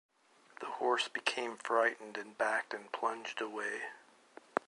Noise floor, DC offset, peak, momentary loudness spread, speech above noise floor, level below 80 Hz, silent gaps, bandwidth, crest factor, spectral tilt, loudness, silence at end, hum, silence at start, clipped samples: -61 dBFS; under 0.1%; -10 dBFS; 13 LU; 25 dB; -90 dBFS; none; 11.5 kHz; 26 dB; -1.5 dB/octave; -36 LUFS; 0.1 s; none; 0.6 s; under 0.1%